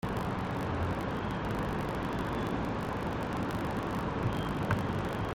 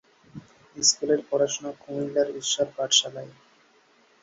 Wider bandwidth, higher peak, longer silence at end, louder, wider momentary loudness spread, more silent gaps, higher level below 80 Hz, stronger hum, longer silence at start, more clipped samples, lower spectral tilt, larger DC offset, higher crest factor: first, 17 kHz vs 8 kHz; second, -16 dBFS vs -6 dBFS; second, 0 s vs 0.9 s; second, -34 LUFS vs -24 LUFS; second, 2 LU vs 14 LU; neither; first, -46 dBFS vs -70 dBFS; neither; second, 0.05 s vs 0.35 s; neither; first, -7 dB/octave vs -1.5 dB/octave; neither; about the same, 18 dB vs 22 dB